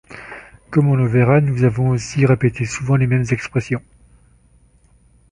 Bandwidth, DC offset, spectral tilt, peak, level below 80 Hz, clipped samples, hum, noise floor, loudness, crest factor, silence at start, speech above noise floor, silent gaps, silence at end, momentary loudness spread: 10.5 kHz; under 0.1%; -7.5 dB/octave; -2 dBFS; -44 dBFS; under 0.1%; none; -53 dBFS; -17 LUFS; 16 dB; 0.1 s; 37 dB; none; 1.55 s; 14 LU